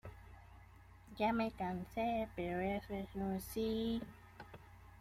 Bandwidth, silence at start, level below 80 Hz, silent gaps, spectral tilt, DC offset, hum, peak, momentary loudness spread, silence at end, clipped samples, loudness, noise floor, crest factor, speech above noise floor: 16 kHz; 0.05 s; -60 dBFS; none; -6.5 dB/octave; under 0.1%; none; -24 dBFS; 22 LU; 0.05 s; under 0.1%; -40 LUFS; -60 dBFS; 16 dB; 21 dB